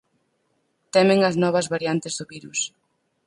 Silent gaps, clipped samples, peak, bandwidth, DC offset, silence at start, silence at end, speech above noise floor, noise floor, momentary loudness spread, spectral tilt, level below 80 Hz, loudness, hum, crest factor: none; under 0.1%; -4 dBFS; 11.5 kHz; under 0.1%; 0.95 s; 0.6 s; 49 dB; -70 dBFS; 13 LU; -4.5 dB/octave; -68 dBFS; -22 LUFS; none; 18 dB